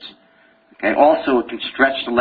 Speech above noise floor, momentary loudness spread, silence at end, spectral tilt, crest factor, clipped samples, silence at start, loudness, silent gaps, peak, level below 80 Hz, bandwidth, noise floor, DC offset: 37 dB; 8 LU; 0 s; -7.5 dB/octave; 18 dB; under 0.1%; 0 s; -17 LUFS; none; -2 dBFS; -54 dBFS; 4.9 kHz; -54 dBFS; under 0.1%